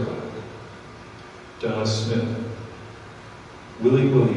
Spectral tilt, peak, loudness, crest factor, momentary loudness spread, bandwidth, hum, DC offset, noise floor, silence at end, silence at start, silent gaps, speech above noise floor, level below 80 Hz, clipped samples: -7 dB/octave; -6 dBFS; -24 LUFS; 18 dB; 22 LU; 10.5 kHz; none; under 0.1%; -42 dBFS; 0 s; 0 s; none; 22 dB; -56 dBFS; under 0.1%